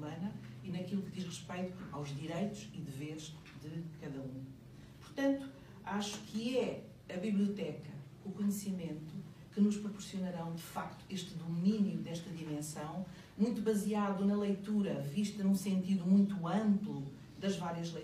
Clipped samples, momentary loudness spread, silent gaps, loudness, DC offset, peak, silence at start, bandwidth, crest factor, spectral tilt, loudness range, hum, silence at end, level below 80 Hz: under 0.1%; 15 LU; none; -38 LUFS; under 0.1%; -20 dBFS; 0 s; 15.5 kHz; 18 dB; -6.5 dB/octave; 9 LU; none; 0 s; -68 dBFS